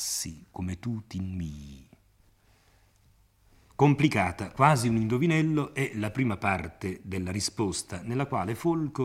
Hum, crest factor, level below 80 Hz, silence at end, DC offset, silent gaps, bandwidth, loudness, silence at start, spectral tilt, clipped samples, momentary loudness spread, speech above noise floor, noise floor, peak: none; 22 dB; -56 dBFS; 0 s; under 0.1%; none; 16 kHz; -28 LUFS; 0 s; -5.5 dB/octave; under 0.1%; 14 LU; 35 dB; -63 dBFS; -6 dBFS